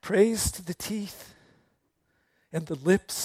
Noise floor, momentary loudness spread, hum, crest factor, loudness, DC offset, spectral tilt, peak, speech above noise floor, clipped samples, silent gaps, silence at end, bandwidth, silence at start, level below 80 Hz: -73 dBFS; 14 LU; none; 20 dB; -28 LUFS; under 0.1%; -4.5 dB/octave; -8 dBFS; 46 dB; under 0.1%; none; 0 s; 16.5 kHz; 0.05 s; -50 dBFS